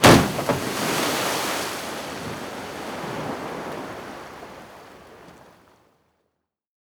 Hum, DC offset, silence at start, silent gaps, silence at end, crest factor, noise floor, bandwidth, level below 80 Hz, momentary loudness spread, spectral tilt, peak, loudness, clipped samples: none; under 0.1%; 0 s; none; 1.5 s; 24 dB; -77 dBFS; over 20 kHz; -46 dBFS; 21 LU; -4 dB/octave; 0 dBFS; -25 LUFS; under 0.1%